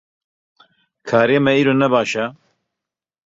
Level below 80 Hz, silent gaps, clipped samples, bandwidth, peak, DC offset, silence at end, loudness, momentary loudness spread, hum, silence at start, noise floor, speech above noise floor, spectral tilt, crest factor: -62 dBFS; none; under 0.1%; 7.8 kHz; -2 dBFS; under 0.1%; 1 s; -16 LUFS; 11 LU; none; 1.05 s; -86 dBFS; 70 dB; -6 dB/octave; 18 dB